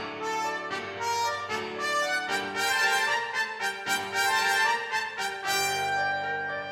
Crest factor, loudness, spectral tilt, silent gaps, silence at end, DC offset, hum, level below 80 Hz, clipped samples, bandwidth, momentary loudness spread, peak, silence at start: 16 dB; -27 LUFS; -1 dB/octave; none; 0 s; under 0.1%; none; -72 dBFS; under 0.1%; 19 kHz; 8 LU; -12 dBFS; 0 s